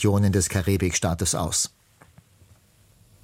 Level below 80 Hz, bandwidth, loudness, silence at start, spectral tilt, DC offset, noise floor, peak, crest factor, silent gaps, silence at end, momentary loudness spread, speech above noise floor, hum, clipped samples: -44 dBFS; 16.5 kHz; -23 LUFS; 0 s; -4.5 dB/octave; under 0.1%; -57 dBFS; -8 dBFS; 18 dB; none; 1.55 s; 3 LU; 35 dB; none; under 0.1%